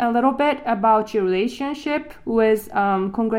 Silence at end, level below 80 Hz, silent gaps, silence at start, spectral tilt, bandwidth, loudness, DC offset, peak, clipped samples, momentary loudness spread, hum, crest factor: 0 s; -52 dBFS; none; 0 s; -6 dB/octave; 16 kHz; -20 LUFS; under 0.1%; -4 dBFS; under 0.1%; 7 LU; none; 16 dB